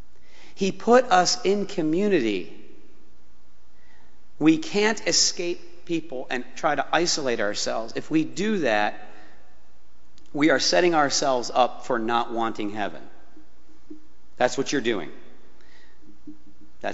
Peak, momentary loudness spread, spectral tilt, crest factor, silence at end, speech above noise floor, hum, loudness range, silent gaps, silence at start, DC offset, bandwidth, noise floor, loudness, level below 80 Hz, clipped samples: -4 dBFS; 12 LU; -2.5 dB/octave; 22 dB; 0 s; 37 dB; none; 7 LU; none; 0.6 s; 3%; 8 kHz; -60 dBFS; -23 LUFS; -60 dBFS; under 0.1%